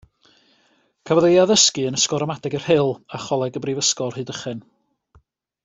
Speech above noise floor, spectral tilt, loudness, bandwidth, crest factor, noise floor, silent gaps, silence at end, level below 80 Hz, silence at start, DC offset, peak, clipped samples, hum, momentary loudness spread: 43 dB; -3.5 dB/octave; -19 LUFS; 8.4 kHz; 20 dB; -62 dBFS; none; 1.05 s; -60 dBFS; 1.05 s; under 0.1%; -2 dBFS; under 0.1%; none; 15 LU